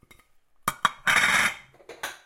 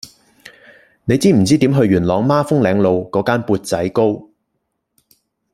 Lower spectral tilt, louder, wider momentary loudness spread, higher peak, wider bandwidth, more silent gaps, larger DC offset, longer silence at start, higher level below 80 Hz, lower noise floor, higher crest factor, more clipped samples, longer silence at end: second, -0.5 dB/octave vs -6.5 dB/octave; second, -23 LUFS vs -15 LUFS; first, 18 LU vs 6 LU; about the same, -4 dBFS vs -2 dBFS; about the same, 17 kHz vs 15.5 kHz; neither; neither; first, 0.65 s vs 0.05 s; second, -58 dBFS vs -50 dBFS; second, -59 dBFS vs -72 dBFS; first, 24 dB vs 14 dB; neither; second, 0.1 s vs 1.3 s